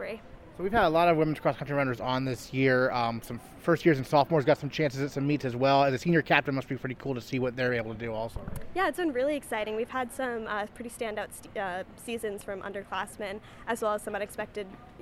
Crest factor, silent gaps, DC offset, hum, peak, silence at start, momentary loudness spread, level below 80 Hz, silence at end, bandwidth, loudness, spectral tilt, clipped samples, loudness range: 24 dB; none; under 0.1%; none; -6 dBFS; 0 s; 14 LU; -54 dBFS; 0 s; 16 kHz; -29 LUFS; -6 dB/octave; under 0.1%; 8 LU